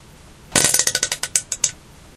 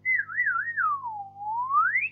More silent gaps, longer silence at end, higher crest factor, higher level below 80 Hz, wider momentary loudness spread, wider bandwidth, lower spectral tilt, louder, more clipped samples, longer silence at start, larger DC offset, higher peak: neither; first, 0.4 s vs 0 s; first, 22 dB vs 12 dB; first, -48 dBFS vs -80 dBFS; second, 7 LU vs 11 LU; first, over 20 kHz vs 3.9 kHz; second, -0.5 dB/octave vs -5.5 dB/octave; first, -18 LUFS vs -26 LUFS; neither; first, 0.5 s vs 0.05 s; neither; first, 0 dBFS vs -14 dBFS